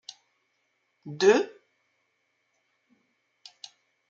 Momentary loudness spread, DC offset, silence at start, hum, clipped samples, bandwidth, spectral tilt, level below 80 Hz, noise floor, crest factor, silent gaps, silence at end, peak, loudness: 26 LU; under 0.1%; 1.05 s; none; under 0.1%; 7.8 kHz; -4 dB/octave; -84 dBFS; -75 dBFS; 24 dB; none; 2.65 s; -8 dBFS; -24 LUFS